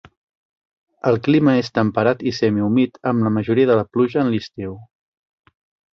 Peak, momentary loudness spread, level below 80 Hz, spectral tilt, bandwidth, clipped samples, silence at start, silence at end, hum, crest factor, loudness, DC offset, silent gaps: -2 dBFS; 9 LU; -54 dBFS; -8 dB/octave; 6.6 kHz; under 0.1%; 1.05 s; 1.1 s; none; 16 dB; -18 LUFS; under 0.1%; none